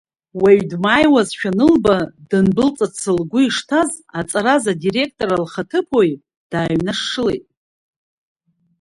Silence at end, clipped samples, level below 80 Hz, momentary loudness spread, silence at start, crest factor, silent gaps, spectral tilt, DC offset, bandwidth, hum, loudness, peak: 1.4 s; under 0.1%; -48 dBFS; 8 LU; 0.35 s; 16 dB; 6.37-6.50 s; -5 dB/octave; under 0.1%; 11.5 kHz; none; -17 LUFS; 0 dBFS